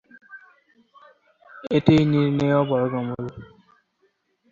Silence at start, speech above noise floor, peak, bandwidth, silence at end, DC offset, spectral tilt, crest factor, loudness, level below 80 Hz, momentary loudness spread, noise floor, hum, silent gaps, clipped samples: 0.3 s; 48 dB; -2 dBFS; 7.4 kHz; 1.05 s; under 0.1%; -8.5 dB/octave; 22 dB; -21 LUFS; -54 dBFS; 18 LU; -68 dBFS; none; none; under 0.1%